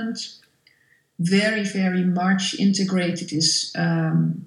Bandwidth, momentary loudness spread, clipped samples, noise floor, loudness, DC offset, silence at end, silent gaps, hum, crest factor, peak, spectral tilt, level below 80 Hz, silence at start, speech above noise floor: 11.5 kHz; 7 LU; under 0.1%; -61 dBFS; -21 LUFS; under 0.1%; 0 s; none; none; 16 dB; -6 dBFS; -4.5 dB/octave; -72 dBFS; 0 s; 40 dB